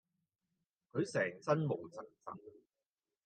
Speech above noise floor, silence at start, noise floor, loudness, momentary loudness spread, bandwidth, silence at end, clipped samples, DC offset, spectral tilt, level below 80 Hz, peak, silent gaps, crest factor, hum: over 51 dB; 0.95 s; under -90 dBFS; -38 LUFS; 16 LU; 9.2 kHz; 0.75 s; under 0.1%; under 0.1%; -6.5 dB/octave; -86 dBFS; -20 dBFS; none; 22 dB; none